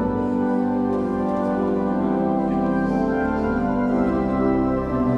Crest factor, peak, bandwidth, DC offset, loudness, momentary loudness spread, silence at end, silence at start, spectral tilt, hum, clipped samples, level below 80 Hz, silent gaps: 14 dB; -8 dBFS; 6.2 kHz; under 0.1%; -22 LUFS; 2 LU; 0 s; 0 s; -9.5 dB/octave; none; under 0.1%; -38 dBFS; none